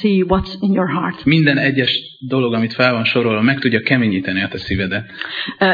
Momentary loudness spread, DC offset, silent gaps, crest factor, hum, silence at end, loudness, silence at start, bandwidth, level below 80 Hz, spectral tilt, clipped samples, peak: 8 LU; under 0.1%; none; 16 dB; none; 0 s; -16 LUFS; 0 s; 5.2 kHz; -40 dBFS; -8 dB/octave; under 0.1%; 0 dBFS